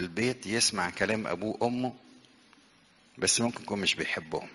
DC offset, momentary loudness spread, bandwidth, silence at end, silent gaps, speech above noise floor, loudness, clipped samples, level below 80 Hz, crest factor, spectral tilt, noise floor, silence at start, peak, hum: under 0.1%; 8 LU; 11.5 kHz; 0 s; none; 31 dB; -29 LUFS; under 0.1%; -64 dBFS; 22 dB; -2.5 dB/octave; -62 dBFS; 0 s; -10 dBFS; none